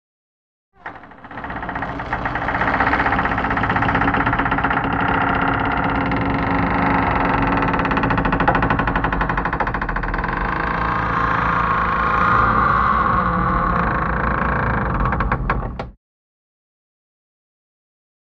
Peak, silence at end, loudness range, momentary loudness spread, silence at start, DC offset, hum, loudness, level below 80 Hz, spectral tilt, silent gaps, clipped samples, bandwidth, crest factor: -2 dBFS; 2.3 s; 5 LU; 9 LU; 0.85 s; 0.2%; none; -19 LUFS; -30 dBFS; -8 dB/octave; none; under 0.1%; 6.6 kHz; 16 dB